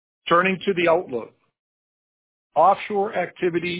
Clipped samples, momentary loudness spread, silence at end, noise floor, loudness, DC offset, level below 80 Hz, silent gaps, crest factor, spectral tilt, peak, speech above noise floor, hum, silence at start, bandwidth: under 0.1%; 8 LU; 0 s; under -90 dBFS; -21 LUFS; under 0.1%; -62 dBFS; 1.59-2.50 s; 18 dB; -9 dB/octave; -6 dBFS; over 69 dB; none; 0.25 s; 4 kHz